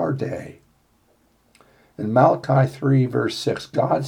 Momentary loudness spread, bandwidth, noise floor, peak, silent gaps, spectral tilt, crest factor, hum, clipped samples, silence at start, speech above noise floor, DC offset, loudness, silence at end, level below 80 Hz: 14 LU; 11.5 kHz; -61 dBFS; -4 dBFS; none; -7.5 dB/octave; 18 dB; none; under 0.1%; 0 s; 41 dB; under 0.1%; -20 LUFS; 0 s; -62 dBFS